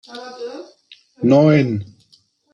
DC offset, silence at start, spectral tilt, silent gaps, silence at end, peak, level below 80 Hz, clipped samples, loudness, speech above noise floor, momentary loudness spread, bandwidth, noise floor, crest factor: under 0.1%; 0.1 s; -8.5 dB/octave; none; 0.7 s; -2 dBFS; -62 dBFS; under 0.1%; -15 LUFS; 40 dB; 21 LU; 7.2 kHz; -57 dBFS; 18 dB